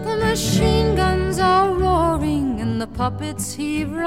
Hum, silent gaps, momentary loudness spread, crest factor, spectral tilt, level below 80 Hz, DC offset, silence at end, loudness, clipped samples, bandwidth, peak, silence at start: none; none; 8 LU; 14 dB; -5.5 dB/octave; -30 dBFS; 0.5%; 0 s; -20 LUFS; under 0.1%; 16.5 kHz; -6 dBFS; 0 s